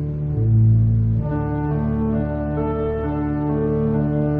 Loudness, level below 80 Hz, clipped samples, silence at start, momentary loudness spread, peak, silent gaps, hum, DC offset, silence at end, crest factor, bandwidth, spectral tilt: -20 LUFS; -32 dBFS; under 0.1%; 0 s; 7 LU; -8 dBFS; none; none; under 0.1%; 0 s; 12 dB; 3.3 kHz; -13 dB/octave